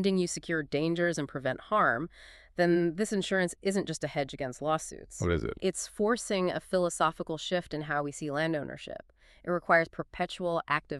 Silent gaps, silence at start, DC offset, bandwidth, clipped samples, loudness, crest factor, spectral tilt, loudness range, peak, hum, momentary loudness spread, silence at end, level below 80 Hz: none; 0 s; under 0.1%; 13 kHz; under 0.1%; -31 LUFS; 20 dB; -5 dB/octave; 2 LU; -10 dBFS; none; 9 LU; 0 s; -54 dBFS